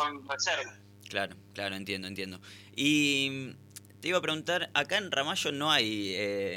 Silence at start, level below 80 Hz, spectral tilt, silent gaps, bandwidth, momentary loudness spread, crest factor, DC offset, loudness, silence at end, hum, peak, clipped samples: 0 s; -76 dBFS; -3 dB/octave; none; 17 kHz; 15 LU; 22 dB; under 0.1%; -30 LUFS; 0 s; 50 Hz at -55 dBFS; -10 dBFS; under 0.1%